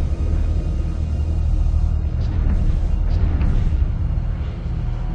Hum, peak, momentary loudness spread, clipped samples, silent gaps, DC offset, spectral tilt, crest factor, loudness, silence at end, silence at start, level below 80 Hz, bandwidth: none; -6 dBFS; 5 LU; under 0.1%; none; under 0.1%; -9 dB/octave; 12 dB; -22 LUFS; 0 s; 0 s; -20 dBFS; 6.6 kHz